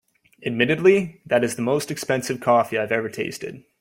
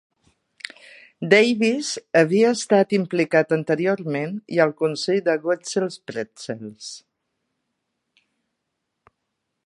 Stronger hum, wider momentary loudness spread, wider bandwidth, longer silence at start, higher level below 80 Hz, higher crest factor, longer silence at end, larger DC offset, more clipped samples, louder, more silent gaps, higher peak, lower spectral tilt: neither; second, 12 LU vs 19 LU; first, 16.5 kHz vs 11.5 kHz; second, 0.4 s vs 1.2 s; first, -62 dBFS vs -74 dBFS; about the same, 20 dB vs 22 dB; second, 0.2 s vs 2.7 s; neither; neither; about the same, -22 LUFS vs -21 LUFS; neither; about the same, -2 dBFS vs -2 dBFS; about the same, -5 dB/octave vs -5 dB/octave